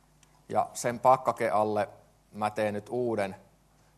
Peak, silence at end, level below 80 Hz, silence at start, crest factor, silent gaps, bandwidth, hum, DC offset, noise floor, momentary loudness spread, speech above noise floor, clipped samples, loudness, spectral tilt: -8 dBFS; 0.6 s; -68 dBFS; 0.5 s; 22 dB; none; 13 kHz; none; under 0.1%; -63 dBFS; 10 LU; 35 dB; under 0.1%; -29 LUFS; -5 dB/octave